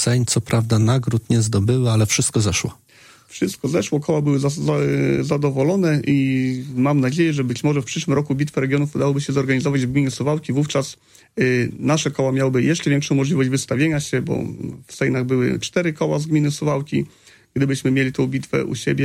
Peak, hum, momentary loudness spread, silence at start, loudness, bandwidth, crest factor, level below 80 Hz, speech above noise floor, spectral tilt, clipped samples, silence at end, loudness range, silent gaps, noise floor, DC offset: -4 dBFS; none; 6 LU; 0 s; -20 LUFS; 15.5 kHz; 14 dB; -50 dBFS; 30 dB; -5.5 dB/octave; under 0.1%; 0 s; 2 LU; none; -49 dBFS; under 0.1%